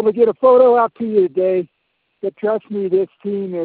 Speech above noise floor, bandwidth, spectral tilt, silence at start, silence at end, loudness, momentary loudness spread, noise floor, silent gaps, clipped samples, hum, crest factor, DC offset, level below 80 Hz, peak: 46 dB; 4.4 kHz; -12 dB/octave; 0 s; 0 s; -16 LUFS; 13 LU; -61 dBFS; none; under 0.1%; none; 14 dB; under 0.1%; -64 dBFS; -2 dBFS